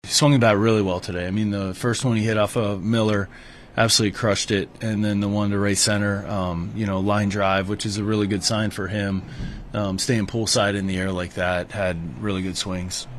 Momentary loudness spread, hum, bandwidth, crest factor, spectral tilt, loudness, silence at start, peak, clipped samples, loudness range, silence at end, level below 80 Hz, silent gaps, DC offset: 9 LU; none; 13.5 kHz; 18 dB; -4.5 dB/octave; -22 LUFS; 0.05 s; -4 dBFS; under 0.1%; 2 LU; 0 s; -46 dBFS; none; under 0.1%